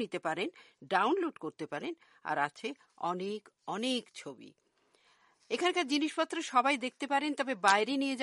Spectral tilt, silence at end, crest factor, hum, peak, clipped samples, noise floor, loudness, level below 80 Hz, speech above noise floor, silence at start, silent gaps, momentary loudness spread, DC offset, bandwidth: -3 dB/octave; 0 s; 24 dB; none; -10 dBFS; under 0.1%; -70 dBFS; -33 LUFS; -86 dBFS; 37 dB; 0 s; none; 14 LU; under 0.1%; 11.5 kHz